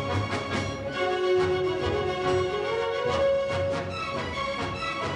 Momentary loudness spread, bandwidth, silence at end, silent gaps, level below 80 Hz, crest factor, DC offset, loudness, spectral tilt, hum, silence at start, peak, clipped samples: 6 LU; 11 kHz; 0 s; none; -48 dBFS; 14 dB; under 0.1%; -27 LUFS; -5.5 dB/octave; none; 0 s; -14 dBFS; under 0.1%